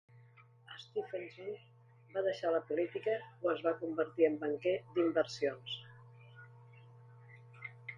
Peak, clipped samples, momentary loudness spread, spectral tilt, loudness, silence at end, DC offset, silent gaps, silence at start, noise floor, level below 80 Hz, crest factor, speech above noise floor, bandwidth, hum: -16 dBFS; under 0.1%; 24 LU; -5.5 dB/octave; -36 LUFS; 0 s; under 0.1%; none; 0.15 s; -62 dBFS; -84 dBFS; 22 dB; 26 dB; 7.6 kHz; none